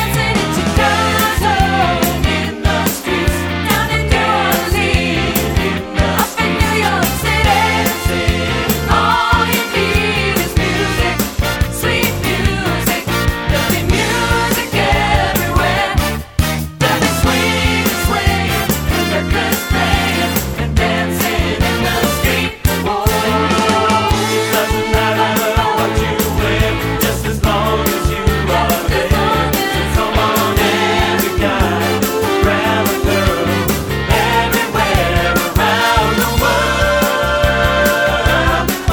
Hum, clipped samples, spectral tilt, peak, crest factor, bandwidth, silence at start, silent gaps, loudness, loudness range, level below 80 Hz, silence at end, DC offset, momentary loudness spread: none; under 0.1%; -4.5 dB/octave; 0 dBFS; 14 dB; over 20 kHz; 0 s; none; -14 LUFS; 2 LU; -24 dBFS; 0 s; under 0.1%; 3 LU